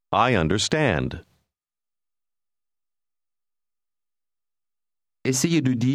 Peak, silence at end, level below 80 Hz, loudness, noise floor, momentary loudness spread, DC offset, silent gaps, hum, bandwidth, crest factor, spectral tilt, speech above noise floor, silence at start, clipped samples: -6 dBFS; 0 s; -48 dBFS; -22 LUFS; under -90 dBFS; 10 LU; under 0.1%; none; none; 15.5 kHz; 20 dB; -4.5 dB/octave; over 69 dB; 0.1 s; under 0.1%